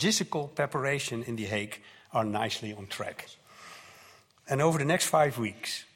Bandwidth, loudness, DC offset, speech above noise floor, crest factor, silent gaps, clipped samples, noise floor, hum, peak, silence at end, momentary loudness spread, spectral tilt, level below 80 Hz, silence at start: 16.5 kHz; -30 LUFS; under 0.1%; 27 dB; 20 dB; none; under 0.1%; -57 dBFS; none; -12 dBFS; 0.1 s; 22 LU; -4 dB/octave; -68 dBFS; 0 s